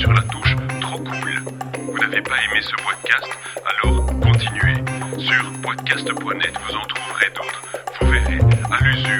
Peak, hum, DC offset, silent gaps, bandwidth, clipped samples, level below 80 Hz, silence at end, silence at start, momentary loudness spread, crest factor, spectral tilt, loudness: 0 dBFS; none; under 0.1%; none; 17 kHz; under 0.1%; -28 dBFS; 0 s; 0 s; 9 LU; 18 dB; -4.5 dB/octave; -19 LUFS